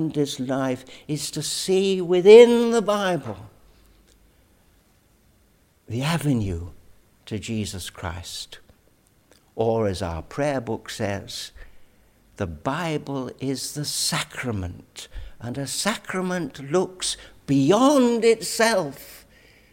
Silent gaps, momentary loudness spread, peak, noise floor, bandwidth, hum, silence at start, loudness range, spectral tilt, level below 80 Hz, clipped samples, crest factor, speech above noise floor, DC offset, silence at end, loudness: none; 17 LU; 0 dBFS; -60 dBFS; 16.5 kHz; none; 0 s; 12 LU; -4.5 dB/octave; -50 dBFS; under 0.1%; 22 dB; 38 dB; under 0.1%; 0.55 s; -22 LUFS